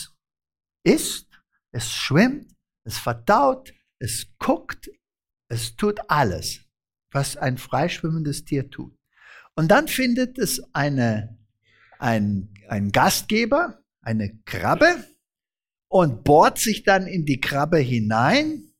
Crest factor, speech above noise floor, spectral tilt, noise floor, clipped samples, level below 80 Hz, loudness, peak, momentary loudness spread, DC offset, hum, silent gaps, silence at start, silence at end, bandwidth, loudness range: 18 dB; over 69 dB; -5 dB/octave; under -90 dBFS; under 0.1%; -48 dBFS; -22 LUFS; -4 dBFS; 15 LU; under 0.1%; none; none; 0 s; 0.15 s; 17 kHz; 6 LU